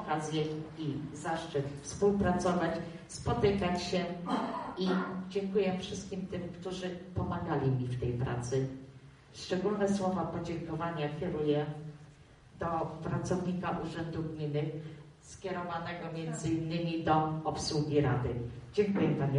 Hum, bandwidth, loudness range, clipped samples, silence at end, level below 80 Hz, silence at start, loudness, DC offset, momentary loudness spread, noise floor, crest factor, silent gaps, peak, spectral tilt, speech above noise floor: none; 11 kHz; 4 LU; under 0.1%; 0 s; -56 dBFS; 0 s; -34 LUFS; under 0.1%; 10 LU; -57 dBFS; 18 dB; none; -16 dBFS; -6.5 dB/octave; 23 dB